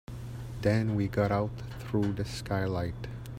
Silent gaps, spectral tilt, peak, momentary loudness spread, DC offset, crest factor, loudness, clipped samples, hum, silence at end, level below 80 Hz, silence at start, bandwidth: none; -7.5 dB/octave; -14 dBFS; 13 LU; under 0.1%; 18 dB; -31 LUFS; under 0.1%; none; 0 s; -48 dBFS; 0.1 s; 15.5 kHz